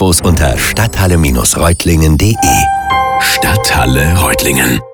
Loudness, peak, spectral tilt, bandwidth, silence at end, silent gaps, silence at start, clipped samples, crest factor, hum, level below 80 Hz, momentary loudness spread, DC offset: -10 LUFS; 0 dBFS; -4 dB/octave; over 20 kHz; 0 s; none; 0 s; under 0.1%; 10 dB; none; -20 dBFS; 2 LU; under 0.1%